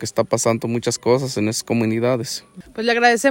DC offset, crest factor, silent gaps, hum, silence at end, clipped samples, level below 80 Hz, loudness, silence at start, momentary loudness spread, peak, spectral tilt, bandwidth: under 0.1%; 16 dB; none; none; 0 s; under 0.1%; -58 dBFS; -19 LUFS; 0 s; 9 LU; -2 dBFS; -4.5 dB/octave; 16.5 kHz